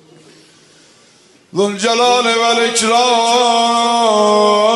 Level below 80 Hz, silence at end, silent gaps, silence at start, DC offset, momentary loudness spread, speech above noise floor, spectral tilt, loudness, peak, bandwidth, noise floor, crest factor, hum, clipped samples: -64 dBFS; 0 s; none; 1.55 s; under 0.1%; 4 LU; 36 dB; -2 dB/octave; -12 LUFS; 0 dBFS; 11.5 kHz; -48 dBFS; 14 dB; none; under 0.1%